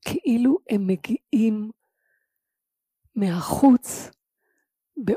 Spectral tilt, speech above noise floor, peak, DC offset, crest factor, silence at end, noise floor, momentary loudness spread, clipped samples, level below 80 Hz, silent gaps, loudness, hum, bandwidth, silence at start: -6.5 dB/octave; 64 dB; -4 dBFS; under 0.1%; 20 dB; 0 s; -85 dBFS; 17 LU; under 0.1%; -58 dBFS; none; -22 LUFS; none; 15.5 kHz; 0.05 s